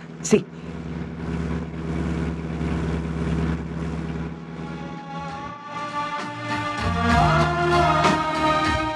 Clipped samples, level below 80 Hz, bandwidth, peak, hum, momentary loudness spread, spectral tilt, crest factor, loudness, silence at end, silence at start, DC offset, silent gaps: under 0.1%; -36 dBFS; 12 kHz; -4 dBFS; none; 14 LU; -5.5 dB/octave; 20 dB; -24 LUFS; 0 s; 0 s; under 0.1%; none